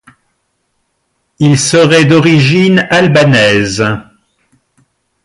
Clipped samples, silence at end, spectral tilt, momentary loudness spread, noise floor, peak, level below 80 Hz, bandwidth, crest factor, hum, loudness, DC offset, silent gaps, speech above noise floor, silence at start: under 0.1%; 1.25 s; -5 dB/octave; 7 LU; -64 dBFS; 0 dBFS; -44 dBFS; 11.5 kHz; 10 dB; none; -8 LUFS; under 0.1%; none; 56 dB; 1.4 s